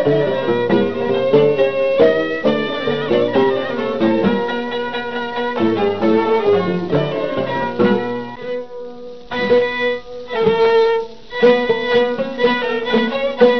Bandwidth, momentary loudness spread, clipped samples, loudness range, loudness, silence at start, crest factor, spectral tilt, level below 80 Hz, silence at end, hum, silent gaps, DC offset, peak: 6.2 kHz; 10 LU; under 0.1%; 3 LU; -17 LUFS; 0 s; 16 dB; -7 dB/octave; -52 dBFS; 0 s; none; none; 1%; 0 dBFS